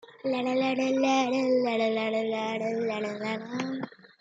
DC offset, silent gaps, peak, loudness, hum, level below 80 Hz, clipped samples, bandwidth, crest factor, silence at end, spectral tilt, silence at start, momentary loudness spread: under 0.1%; none; -14 dBFS; -28 LUFS; none; -80 dBFS; under 0.1%; 7.8 kHz; 14 dB; 0.3 s; -4.5 dB/octave; 0.1 s; 9 LU